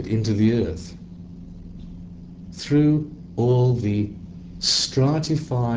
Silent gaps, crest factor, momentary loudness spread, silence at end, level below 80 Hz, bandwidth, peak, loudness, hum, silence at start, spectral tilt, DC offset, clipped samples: none; 14 dB; 21 LU; 0 s; -44 dBFS; 8 kHz; -8 dBFS; -21 LUFS; none; 0 s; -6 dB/octave; under 0.1%; under 0.1%